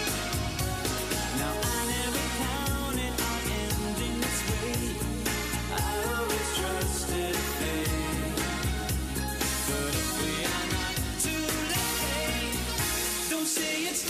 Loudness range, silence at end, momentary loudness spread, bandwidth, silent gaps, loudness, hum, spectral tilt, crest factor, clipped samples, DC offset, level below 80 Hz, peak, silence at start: 1 LU; 0 s; 3 LU; 15.5 kHz; none; -29 LUFS; none; -3 dB/octave; 14 dB; under 0.1%; under 0.1%; -38 dBFS; -16 dBFS; 0 s